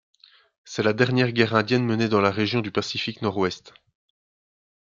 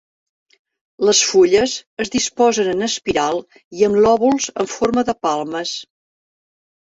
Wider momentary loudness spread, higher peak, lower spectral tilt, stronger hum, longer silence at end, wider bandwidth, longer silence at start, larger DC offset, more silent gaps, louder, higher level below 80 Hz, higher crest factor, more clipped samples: second, 7 LU vs 11 LU; about the same, -4 dBFS vs -2 dBFS; first, -6 dB/octave vs -3 dB/octave; neither; first, 1.15 s vs 1 s; about the same, 7.6 kHz vs 8 kHz; second, 0.65 s vs 1 s; neither; second, none vs 1.87-1.97 s, 3.64-3.71 s; second, -23 LUFS vs -17 LUFS; second, -64 dBFS vs -52 dBFS; about the same, 20 dB vs 16 dB; neither